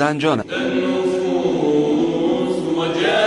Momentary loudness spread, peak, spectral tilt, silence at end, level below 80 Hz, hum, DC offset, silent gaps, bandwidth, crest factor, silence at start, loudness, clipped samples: 3 LU; -4 dBFS; -5.5 dB/octave; 0 s; -54 dBFS; none; under 0.1%; none; 11 kHz; 12 dB; 0 s; -19 LUFS; under 0.1%